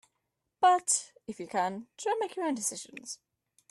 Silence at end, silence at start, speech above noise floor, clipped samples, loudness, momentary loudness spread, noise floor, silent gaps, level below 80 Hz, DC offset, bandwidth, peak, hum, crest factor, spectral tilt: 0.55 s; 0.6 s; 52 dB; under 0.1%; -30 LUFS; 18 LU; -83 dBFS; none; -80 dBFS; under 0.1%; 12.5 kHz; -14 dBFS; none; 18 dB; -2 dB/octave